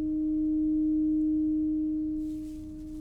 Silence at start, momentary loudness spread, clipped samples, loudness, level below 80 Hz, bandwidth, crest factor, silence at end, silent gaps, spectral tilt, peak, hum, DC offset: 0 s; 12 LU; under 0.1%; -29 LUFS; -46 dBFS; 0.9 kHz; 8 dB; 0 s; none; -10 dB/octave; -22 dBFS; none; under 0.1%